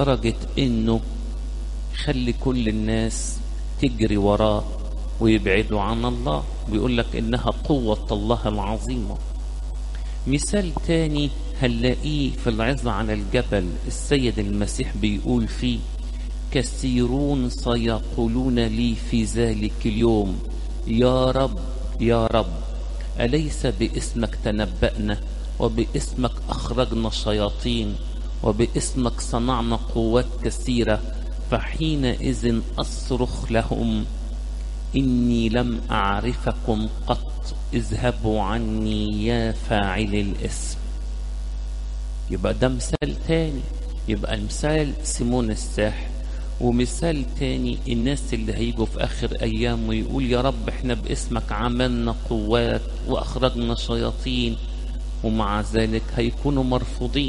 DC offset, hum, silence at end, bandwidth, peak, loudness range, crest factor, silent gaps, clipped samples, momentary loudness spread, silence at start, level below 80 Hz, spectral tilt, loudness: under 0.1%; none; 0 s; 11.5 kHz; -4 dBFS; 3 LU; 18 dB; none; under 0.1%; 10 LU; 0 s; -28 dBFS; -5.5 dB/octave; -24 LUFS